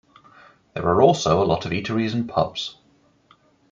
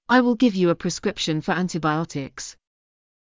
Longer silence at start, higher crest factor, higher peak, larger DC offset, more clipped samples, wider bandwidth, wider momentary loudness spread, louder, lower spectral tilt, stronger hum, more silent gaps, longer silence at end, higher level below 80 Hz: first, 0.75 s vs 0.1 s; about the same, 22 dB vs 20 dB; about the same, -2 dBFS vs -4 dBFS; neither; neither; about the same, 7.6 kHz vs 7.6 kHz; about the same, 13 LU vs 14 LU; about the same, -21 LUFS vs -22 LUFS; about the same, -5.5 dB/octave vs -5 dB/octave; neither; neither; first, 1 s vs 0.85 s; about the same, -52 dBFS vs -56 dBFS